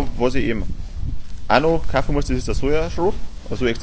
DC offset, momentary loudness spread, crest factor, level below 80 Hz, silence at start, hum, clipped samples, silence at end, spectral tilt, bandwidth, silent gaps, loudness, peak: under 0.1%; 14 LU; 18 dB; -28 dBFS; 0 s; none; under 0.1%; 0 s; -6 dB/octave; 8 kHz; none; -22 LUFS; 0 dBFS